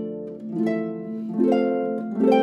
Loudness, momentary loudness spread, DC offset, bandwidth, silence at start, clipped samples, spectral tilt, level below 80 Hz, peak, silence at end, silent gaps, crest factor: -24 LUFS; 11 LU; under 0.1%; 8.2 kHz; 0 s; under 0.1%; -8.5 dB/octave; -76 dBFS; -6 dBFS; 0 s; none; 16 dB